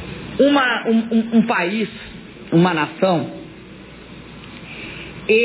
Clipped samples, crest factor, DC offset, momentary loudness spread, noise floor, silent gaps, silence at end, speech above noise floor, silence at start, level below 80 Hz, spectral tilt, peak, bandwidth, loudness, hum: under 0.1%; 16 dB; under 0.1%; 22 LU; -39 dBFS; none; 0 s; 22 dB; 0 s; -50 dBFS; -10.5 dB/octave; -4 dBFS; 4 kHz; -18 LUFS; none